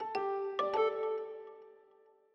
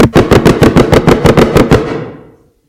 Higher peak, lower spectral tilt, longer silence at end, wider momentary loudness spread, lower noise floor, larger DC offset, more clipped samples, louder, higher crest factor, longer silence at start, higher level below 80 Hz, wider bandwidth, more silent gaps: second, -20 dBFS vs 0 dBFS; second, -4.5 dB/octave vs -6.5 dB/octave; about the same, 0.6 s vs 0.55 s; first, 19 LU vs 12 LU; first, -65 dBFS vs -39 dBFS; neither; second, under 0.1% vs 0.9%; second, -35 LUFS vs -7 LUFS; first, 18 dB vs 8 dB; about the same, 0 s vs 0 s; second, -84 dBFS vs -22 dBFS; second, 6.4 kHz vs 17.5 kHz; neither